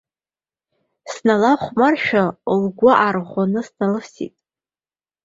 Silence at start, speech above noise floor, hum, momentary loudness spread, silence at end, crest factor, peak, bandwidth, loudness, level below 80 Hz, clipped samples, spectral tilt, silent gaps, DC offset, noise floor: 1.05 s; over 73 dB; none; 15 LU; 0.95 s; 18 dB; 0 dBFS; 7.8 kHz; -18 LUFS; -60 dBFS; under 0.1%; -6.5 dB/octave; none; under 0.1%; under -90 dBFS